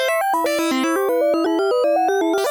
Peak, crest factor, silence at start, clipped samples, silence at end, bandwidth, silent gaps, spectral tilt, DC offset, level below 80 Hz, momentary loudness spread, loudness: -10 dBFS; 8 dB; 0 s; under 0.1%; 0 s; over 20 kHz; none; -2 dB/octave; under 0.1%; -66 dBFS; 2 LU; -18 LUFS